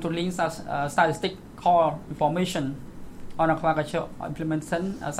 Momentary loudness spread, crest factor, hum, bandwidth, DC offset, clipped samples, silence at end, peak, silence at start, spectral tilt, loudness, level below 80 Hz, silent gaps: 11 LU; 20 dB; none; 15.5 kHz; under 0.1%; under 0.1%; 0 s; -6 dBFS; 0 s; -5.5 dB/octave; -26 LUFS; -48 dBFS; none